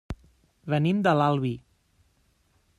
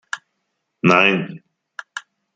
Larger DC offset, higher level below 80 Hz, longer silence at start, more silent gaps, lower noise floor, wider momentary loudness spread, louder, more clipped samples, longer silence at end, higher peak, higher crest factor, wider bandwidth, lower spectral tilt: neither; first, -52 dBFS vs -62 dBFS; about the same, 0.1 s vs 0.15 s; neither; second, -67 dBFS vs -74 dBFS; second, 20 LU vs 23 LU; second, -25 LUFS vs -16 LUFS; neither; first, 1.2 s vs 0.35 s; second, -10 dBFS vs -2 dBFS; about the same, 18 dB vs 20 dB; first, 11 kHz vs 9.2 kHz; first, -8 dB/octave vs -5.5 dB/octave